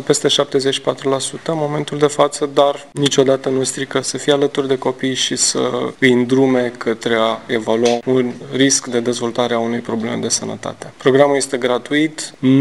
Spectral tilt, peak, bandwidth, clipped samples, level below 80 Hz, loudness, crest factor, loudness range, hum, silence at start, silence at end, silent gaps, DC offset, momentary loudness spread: -3.5 dB/octave; 0 dBFS; 12.5 kHz; under 0.1%; -58 dBFS; -16 LUFS; 16 dB; 2 LU; none; 0 s; 0 s; none; 0.3%; 7 LU